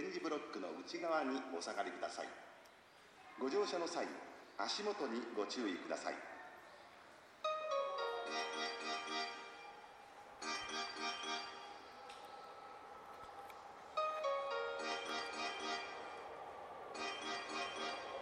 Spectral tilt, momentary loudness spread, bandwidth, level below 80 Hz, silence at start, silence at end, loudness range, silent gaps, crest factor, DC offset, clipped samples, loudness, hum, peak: -2 dB/octave; 16 LU; 14.5 kHz; -82 dBFS; 0 s; 0 s; 4 LU; none; 18 dB; under 0.1%; under 0.1%; -43 LUFS; none; -26 dBFS